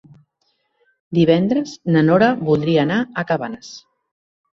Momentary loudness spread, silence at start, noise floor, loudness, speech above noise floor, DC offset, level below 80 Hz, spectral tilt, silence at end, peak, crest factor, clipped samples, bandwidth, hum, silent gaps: 10 LU; 1.1 s; -68 dBFS; -17 LUFS; 51 dB; under 0.1%; -56 dBFS; -7 dB/octave; 0.75 s; -2 dBFS; 18 dB; under 0.1%; 7.4 kHz; none; none